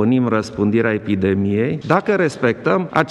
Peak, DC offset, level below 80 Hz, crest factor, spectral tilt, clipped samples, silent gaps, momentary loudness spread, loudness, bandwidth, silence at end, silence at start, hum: 0 dBFS; under 0.1%; -54 dBFS; 18 dB; -7.5 dB/octave; under 0.1%; none; 3 LU; -18 LUFS; 11 kHz; 0 s; 0 s; none